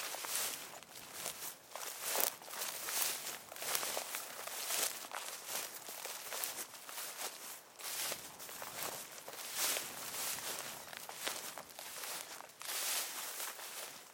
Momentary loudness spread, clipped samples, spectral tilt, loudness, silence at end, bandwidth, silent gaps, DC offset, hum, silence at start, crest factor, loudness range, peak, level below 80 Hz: 11 LU; under 0.1%; 1 dB/octave; -40 LUFS; 0 s; 17 kHz; none; under 0.1%; none; 0 s; 32 dB; 4 LU; -10 dBFS; -84 dBFS